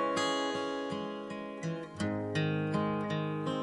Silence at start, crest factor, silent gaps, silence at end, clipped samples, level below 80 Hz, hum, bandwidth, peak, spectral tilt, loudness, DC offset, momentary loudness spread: 0 s; 14 dB; none; 0 s; under 0.1%; -70 dBFS; none; 11.5 kHz; -18 dBFS; -5.5 dB/octave; -34 LUFS; under 0.1%; 8 LU